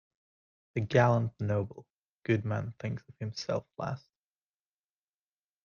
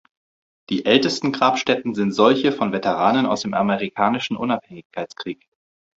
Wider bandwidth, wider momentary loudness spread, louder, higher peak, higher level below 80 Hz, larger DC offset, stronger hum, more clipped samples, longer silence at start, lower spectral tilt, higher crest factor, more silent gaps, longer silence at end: second, 7 kHz vs 8 kHz; about the same, 14 LU vs 15 LU; second, -32 LUFS vs -20 LUFS; second, -10 dBFS vs -2 dBFS; second, -66 dBFS vs -60 dBFS; neither; first, 50 Hz at -60 dBFS vs none; neither; about the same, 0.75 s vs 0.7 s; first, -7 dB/octave vs -5 dB/octave; about the same, 22 dB vs 18 dB; first, 1.90-2.19 s vs 4.85-4.90 s; first, 1.65 s vs 0.6 s